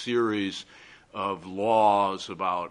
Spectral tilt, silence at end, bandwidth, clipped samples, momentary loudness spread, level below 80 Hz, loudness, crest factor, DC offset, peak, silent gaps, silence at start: -5 dB/octave; 0 s; 10.5 kHz; under 0.1%; 17 LU; -68 dBFS; -26 LUFS; 18 dB; under 0.1%; -10 dBFS; none; 0 s